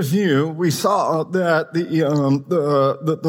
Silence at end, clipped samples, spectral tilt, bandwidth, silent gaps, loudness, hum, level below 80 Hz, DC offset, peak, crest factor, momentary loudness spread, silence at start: 0 s; under 0.1%; -6.5 dB/octave; 18.5 kHz; none; -19 LUFS; none; -66 dBFS; under 0.1%; -6 dBFS; 14 dB; 2 LU; 0 s